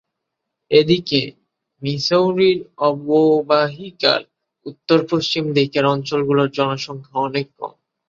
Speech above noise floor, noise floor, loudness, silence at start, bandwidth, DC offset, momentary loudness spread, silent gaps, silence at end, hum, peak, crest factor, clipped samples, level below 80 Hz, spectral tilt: 61 dB; -79 dBFS; -18 LUFS; 0.7 s; 7.4 kHz; under 0.1%; 14 LU; none; 0.4 s; none; -2 dBFS; 18 dB; under 0.1%; -60 dBFS; -6 dB/octave